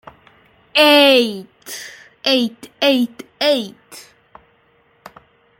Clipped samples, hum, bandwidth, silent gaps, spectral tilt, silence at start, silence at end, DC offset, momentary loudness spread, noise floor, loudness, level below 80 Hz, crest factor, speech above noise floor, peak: under 0.1%; none; 16.5 kHz; none; -2.5 dB/octave; 0.75 s; 1.6 s; under 0.1%; 22 LU; -57 dBFS; -15 LUFS; -66 dBFS; 18 dB; 41 dB; 0 dBFS